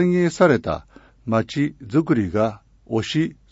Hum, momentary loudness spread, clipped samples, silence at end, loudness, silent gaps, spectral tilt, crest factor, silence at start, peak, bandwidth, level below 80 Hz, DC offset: none; 10 LU; under 0.1%; 0.2 s; -21 LUFS; none; -7 dB/octave; 18 dB; 0 s; -4 dBFS; 8 kHz; -48 dBFS; under 0.1%